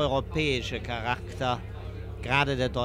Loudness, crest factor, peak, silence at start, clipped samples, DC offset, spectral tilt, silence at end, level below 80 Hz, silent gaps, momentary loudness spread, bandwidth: -28 LUFS; 20 dB; -10 dBFS; 0 s; under 0.1%; under 0.1%; -5.5 dB/octave; 0 s; -42 dBFS; none; 13 LU; 15 kHz